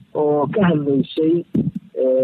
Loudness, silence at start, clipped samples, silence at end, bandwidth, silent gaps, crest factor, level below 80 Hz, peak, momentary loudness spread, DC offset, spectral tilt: -19 LUFS; 0.15 s; under 0.1%; 0 s; 4.6 kHz; none; 12 dB; -56 dBFS; -6 dBFS; 5 LU; under 0.1%; -10.5 dB/octave